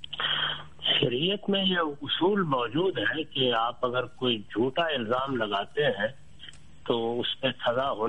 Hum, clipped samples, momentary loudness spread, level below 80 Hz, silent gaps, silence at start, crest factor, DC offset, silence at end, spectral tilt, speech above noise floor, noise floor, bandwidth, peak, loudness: none; under 0.1%; 6 LU; -62 dBFS; none; 0.1 s; 18 dB; 0.5%; 0 s; -6.5 dB/octave; 22 dB; -50 dBFS; 9 kHz; -10 dBFS; -27 LUFS